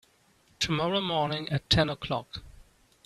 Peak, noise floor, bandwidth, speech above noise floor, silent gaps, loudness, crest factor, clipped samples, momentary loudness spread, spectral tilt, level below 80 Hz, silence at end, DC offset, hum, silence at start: -10 dBFS; -64 dBFS; 13 kHz; 36 dB; none; -28 LUFS; 20 dB; under 0.1%; 10 LU; -4.5 dB/octave; -50 dBFS; 0.55 s; under 0.1%; none; 0.6 s